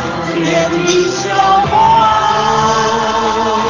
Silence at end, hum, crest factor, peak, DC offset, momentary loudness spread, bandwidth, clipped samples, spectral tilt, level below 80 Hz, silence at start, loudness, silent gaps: 0 s; none; 12 dB; 0 dBFS; under 0.1%; 5 LU; 7.6 kHz; under 0.1%; -4 dB/octave; -38 dBFS; 0 s; -12 LUFS; none